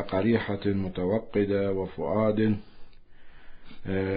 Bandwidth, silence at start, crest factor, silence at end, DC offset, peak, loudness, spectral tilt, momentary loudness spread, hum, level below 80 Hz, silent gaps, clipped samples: 5 kHz; 0 s; 16 dB; 0 s; under 0.1%; -12 dBFS; -28 LUFS; -11.5 dB/octave; 6 LU; none; -50 dBFS; none; under 0.1%